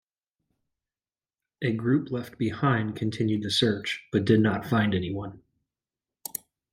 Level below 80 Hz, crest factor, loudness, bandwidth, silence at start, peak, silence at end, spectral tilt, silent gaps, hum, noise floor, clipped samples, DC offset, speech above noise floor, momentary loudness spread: -62 dBFS; 20 dB; -27 LUFS; 16 kHz; 1.6 s; -8 dBFS; 1.35 s; -6 dB/octave; none; none; under -90 dBFS; under 0.1%; under 0.1%; over 64 dB; 14 LU